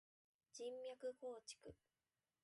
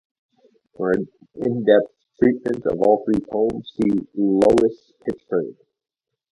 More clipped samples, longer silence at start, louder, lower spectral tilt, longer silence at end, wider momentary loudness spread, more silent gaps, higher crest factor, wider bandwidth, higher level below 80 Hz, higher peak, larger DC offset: neither; second, 0.55 s vs 0.8 s; second, -54 LUFS vs -20 LUFS; second, -3 dB/octave vs -7.5 dB/octave; about the same, 0.7 s vs 0.8 s; second, 11 LU vs 14 LU; neither; about the same, 16 dB vs 20 dB; about the same, 11.5 kHz vs 11.5 kHz; second, -84 dBFS vs -52 dBFS; second, -40 dBFS vs -2 dBFS; neither